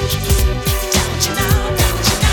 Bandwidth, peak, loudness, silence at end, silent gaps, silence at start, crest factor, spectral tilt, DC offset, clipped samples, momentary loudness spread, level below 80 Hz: 19.5 kHz; -2 dBFS; -16 LUFS; 0 s; none; 0 s; 14 dB; -3.5 dB/octave; under 0.1%; under 0.1%; 2 LU; -20 dBFS